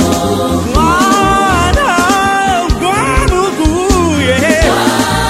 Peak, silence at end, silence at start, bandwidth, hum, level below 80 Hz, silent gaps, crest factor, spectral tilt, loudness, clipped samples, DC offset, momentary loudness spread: 0 dBFS; 0 s; 0 s; 16.5 kHz; none; -20 dBFS; none; 10 dB; -4.5 dB/octave; -10 LUFS; under 0.1%; under 0.1%; 3 LU